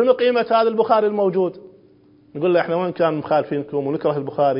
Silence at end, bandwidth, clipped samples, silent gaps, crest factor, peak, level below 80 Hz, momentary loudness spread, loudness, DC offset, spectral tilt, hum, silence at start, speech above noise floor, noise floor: 0 s; 5.4 kHz; under 0.1%; none; 16 dB; -2 dBFS; -66 dBFS; 7 LU; -19 LUFS; under 0.1%; -11 dB/octave; none; 0 s; 33 dB; -52 dBFS